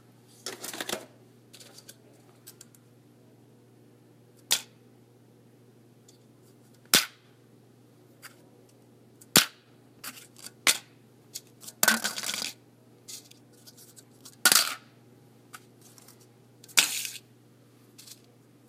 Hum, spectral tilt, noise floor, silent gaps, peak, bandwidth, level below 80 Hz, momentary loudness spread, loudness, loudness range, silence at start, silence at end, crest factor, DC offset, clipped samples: none; 0 dB/octave; -57 dBFS; none; 0 dBFS; 16 kHz; -76 dBFS; 28 LU; -26 LUFS; 10 LU; 0.45 s; 0.55 s; 34 dB; under 0.1%; under 0.1%